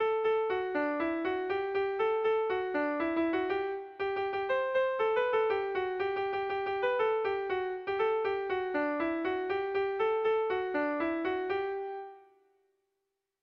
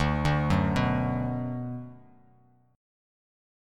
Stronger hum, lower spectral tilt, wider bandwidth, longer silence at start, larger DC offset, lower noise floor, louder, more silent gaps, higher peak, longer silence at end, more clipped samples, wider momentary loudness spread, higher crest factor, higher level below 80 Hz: neither; about the same, -6.5 dB/octave vs -7.5 dB/octave; second, 6 kHz vs 11 kHz; about the same, 0 s vs 0 s; neither; first, -84 dBFS vs -62 dBFS; second, -31 LUFS vs -28 LUFS; neither; second, -18 dBFS vs -12 dBFS; second, 1.25 s vs 1.75 s; neither; second, 5 LU vs 13 LU; second, 12 dB vs 18 dB; second, -68 dBFS vs -42 dBFS